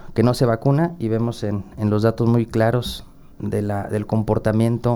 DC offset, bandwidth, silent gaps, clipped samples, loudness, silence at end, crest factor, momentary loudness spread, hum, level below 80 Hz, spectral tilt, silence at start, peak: under 0.1%; 16.5 kHz; none; under 0.1%; -21 LUFS; 0 s; 16 dB; 8 LU; none; -42 dBFS; -7.5 dB/octave; 0 s; -4 dBFS